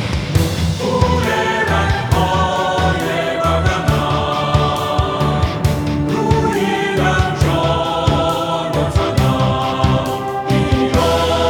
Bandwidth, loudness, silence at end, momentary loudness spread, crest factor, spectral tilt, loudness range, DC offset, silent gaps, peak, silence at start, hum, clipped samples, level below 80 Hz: 19.5 kHz; -16 LUFS; 0 s; 3 LU; 16 dB; -6 dB/octave; 1 LU; under 0.1%; none; 0 dBFS; 0 s; none; under 0.1%; -26 dBFS